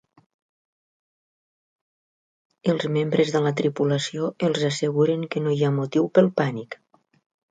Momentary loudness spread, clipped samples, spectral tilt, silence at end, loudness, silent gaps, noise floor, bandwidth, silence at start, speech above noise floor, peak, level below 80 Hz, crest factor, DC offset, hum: 8 LU; under 0.1%; -6.5 dB/octave; 0.75 s; -23 LUFS; none; under -90 dBFS; 9.4 kHz; 2.65 s; over 68 dB; -4 dBFS; -68 dBFS; 20 dB; under 0.1%; none